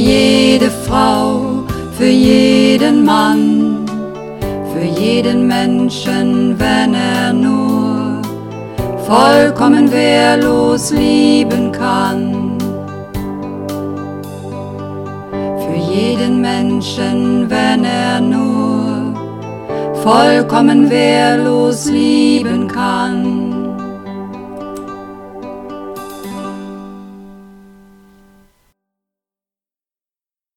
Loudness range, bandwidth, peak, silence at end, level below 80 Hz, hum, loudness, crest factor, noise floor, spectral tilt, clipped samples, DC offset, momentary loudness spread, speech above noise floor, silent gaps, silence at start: 16 LU; 17 kHz; 0 dBFS; 3.1 s; -40 dBFS; none; -12 LUFS; 14 dB; under -90 dBFS; -5.5 dB/octave; under 0.1%; under 0.1%; 17 LU; over 79 dB; none; 0 s